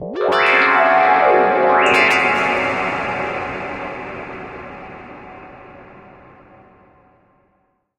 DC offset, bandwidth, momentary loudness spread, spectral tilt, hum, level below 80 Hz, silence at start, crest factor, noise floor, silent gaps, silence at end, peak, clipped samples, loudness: under 0.1%; 15 kHz; 22 LU; -4 dB/octave; none; -52 dBFS; 0 s; 18 dB; -64 dBFS; none; 2 s; 0 dBFS; under 0.1%; -15 LUFS